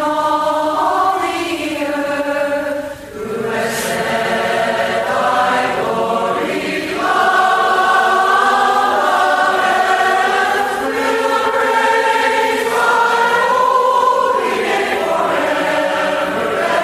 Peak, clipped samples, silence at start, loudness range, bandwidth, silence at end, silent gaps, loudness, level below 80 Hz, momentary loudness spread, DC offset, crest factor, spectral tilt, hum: -2 dBFS; under 0.1%; 0 s; 5 LU; 15.5 kHz; 0 s; none; -15 LUFS; -52 dBFS; 6 LU; under 0.1%; 12 dB; -3 dB/octave; none